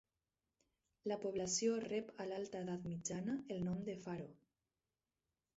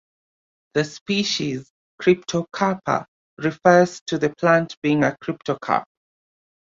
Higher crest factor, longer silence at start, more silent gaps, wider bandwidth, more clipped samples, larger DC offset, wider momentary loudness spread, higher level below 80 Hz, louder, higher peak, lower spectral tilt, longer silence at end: about the same, 18 dB vs 20 dB; first, 1.05 s vs 0.75 s; second, none vs 1.01-1.06 s, 1.70-1.98 s, 3.08-3.37 s, 4.01-4.06 s, 4.77-4.82 s; about the same, 8 kHz vs 7.8 kHz; neither; neither; about the same, 10 LU vs 10 LU; second, -76 dBFS vs -62 dBFS; second, -43 LUFS vs -21 LUFS; second, -26 dBFS vs -2 dBFS; about the same, -6 dB/octave vs -5 dB/octave; first, 1.2 s vs 0.9 s